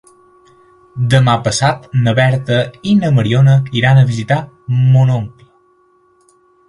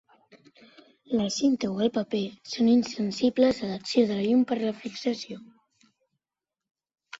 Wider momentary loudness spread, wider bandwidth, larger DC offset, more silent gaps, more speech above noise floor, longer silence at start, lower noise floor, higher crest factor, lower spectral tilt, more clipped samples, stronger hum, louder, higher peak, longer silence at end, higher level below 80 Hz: about the same, 8 LU vs 9 LU; first, 11 kHz vs 7.8 kHz; neither; second, none vs 6.71-6.75 s; second, 41 dB vs 64 dB; second, 0.95 s vs 1.1 s; second, -53 dBFS vs -90 dBFS; about the same, 14 dB vs 18 dB; first, -6.5 dB/octave vs -5 dB/octave; neither; neither; first, -13 LUFS vs -26 LUFS; first, 0 dBFS vs -10 dBFS; first, 1.4 s vs 0.05 s; first, -46 dBFS vs -66 dBFS